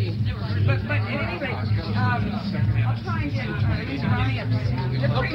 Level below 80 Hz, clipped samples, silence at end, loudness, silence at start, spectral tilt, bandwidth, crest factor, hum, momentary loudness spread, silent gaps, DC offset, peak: -38 dBFS; under 0.1%; 0 s; -24 LUFS; 0 s; -8.5 dB/octave; 6 kHz; 14 dB; none; 3 LU; none; under 0.1%; -10 dBFS